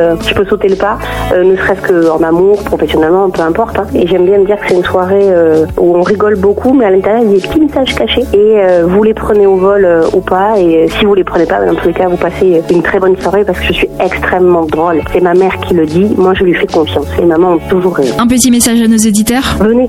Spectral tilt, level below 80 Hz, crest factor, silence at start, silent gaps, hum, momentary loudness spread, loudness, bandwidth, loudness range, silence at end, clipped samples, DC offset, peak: -5 dB/octave; -28 dBFS; 8 dB; 0 s; none; none; 4 LU; -9 LUFS; 16.5 kHz; 2 LU; 0 s; under 0.1%; 0.1%; 0 dBFS